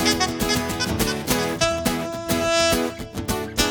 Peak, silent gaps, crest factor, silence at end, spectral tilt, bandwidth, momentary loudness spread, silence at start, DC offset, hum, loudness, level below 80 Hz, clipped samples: -2 dBFS; none; 20 dB; 0 s; -3.5 dB/octave; 19 kHz; 8 LU; 0 s; under 0.1%; none; -22 LUFS; -38 dBFS; under 0.1%